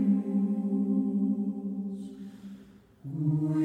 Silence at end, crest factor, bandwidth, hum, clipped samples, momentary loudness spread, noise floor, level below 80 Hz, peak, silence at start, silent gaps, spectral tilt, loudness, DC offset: 0 s; 12 dB; 3.6 kHz; none; under 0.1%; 19 LU; -53 dBFS; -70 dBFS; -16 dBFS; 0 s; none; -11 dB/octave; -30 LUFS; under 0.1%